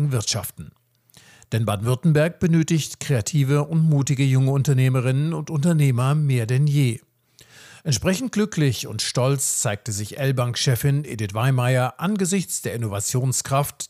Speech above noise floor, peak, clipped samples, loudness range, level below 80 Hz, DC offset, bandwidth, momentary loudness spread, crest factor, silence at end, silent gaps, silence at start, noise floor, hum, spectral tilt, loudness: 34 dB; -8 dBFS; under 0.1%; 3 LU; -56 dBFS; under 0.1%; 15.5 kHz; 6 LU; 14 dB; 0.05 s; none; 0 s; -54 dBFS; none; -5.5 dB/octave; -21 LUFS